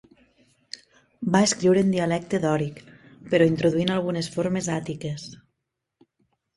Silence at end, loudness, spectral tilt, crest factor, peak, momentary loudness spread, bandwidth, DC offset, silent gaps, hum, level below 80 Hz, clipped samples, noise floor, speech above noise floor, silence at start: 1.2 s; -23 LUFS; -5.5 dB/octave; 20 dB; -4 dBFS; 20 LU; 11.5 kHz; under 0.1%; none; none; -60 dBFS; under 0.1%; -81 dBFS; 58 dB; 1.2 s